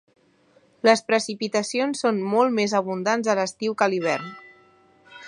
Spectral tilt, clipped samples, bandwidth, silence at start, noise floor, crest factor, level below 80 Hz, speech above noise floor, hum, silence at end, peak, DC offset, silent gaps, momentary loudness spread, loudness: -4 dB/octave; under 0.1%; 11.5 kHz; 0.85 s; -59 dBFS; 22 dB; -74 dBFS; 37 dB; none; 0 s; -2 dBFS; under 0.1%; none; 6 LU; -23 LUFS